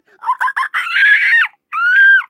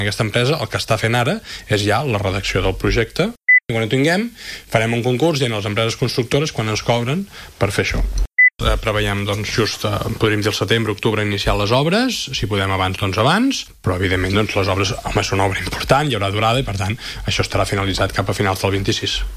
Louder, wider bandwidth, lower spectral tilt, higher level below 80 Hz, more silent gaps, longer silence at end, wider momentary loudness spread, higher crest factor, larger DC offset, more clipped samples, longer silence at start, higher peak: first, -12 LUFS vs -18 LUFS; about the same, 15 kHz vs 15.5 kHz; second, 4 dB/octave vs -5 dB/octave; second, under -90 dBFS vs -32 dBFS; neither; about the same, 0.05 s vs 0 s; first, 10 LU vs 6 LU; second, 12 dB vs 18 dB; neither; neither; first, 0.25 s vs 0 s; about the same, -2 dBFS vs 0 dBFS